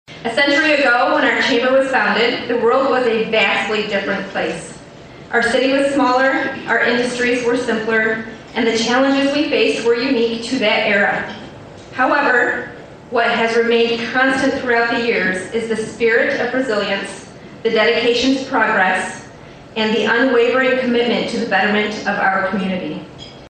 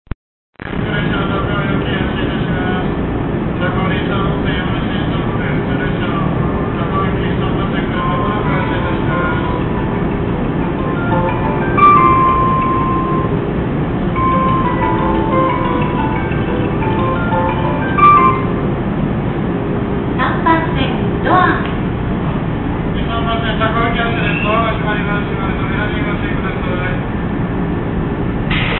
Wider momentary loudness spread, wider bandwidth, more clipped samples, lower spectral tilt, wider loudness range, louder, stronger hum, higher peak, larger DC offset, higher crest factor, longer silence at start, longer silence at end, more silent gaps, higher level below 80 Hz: first, 10 LU vs 6 LU; first, 9.4 kHz vs 4.2 kHz; neither; second, -4 dB/octave vs -12 dB/octave; about the same, 2 LU vs 4 LU; about the same, -16 LUFS vs -16 LUFS; neither; about the same, -2 dBFS vs 0 dBFS; neither; about the same, 14 dB vs 14 dB; second, 0.1 s vs 0.6 s; about the same, 0 s vs 0 s; neither; second, -52 dBFS vs -26 dBFS